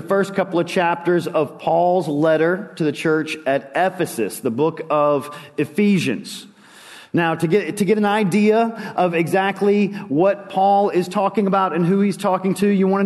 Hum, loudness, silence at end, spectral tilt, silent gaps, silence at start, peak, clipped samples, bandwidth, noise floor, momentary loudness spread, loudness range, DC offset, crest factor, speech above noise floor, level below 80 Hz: none; -19 LUFS; 0 s; -6.5 dB/octave; none; 0 s; -4 dBFS; under 0.1%; 12.5 kHz; -43 dBFS; 6 LU; 3 LU; under 0.1%; 14 dB; 25 dB; -68 dBFS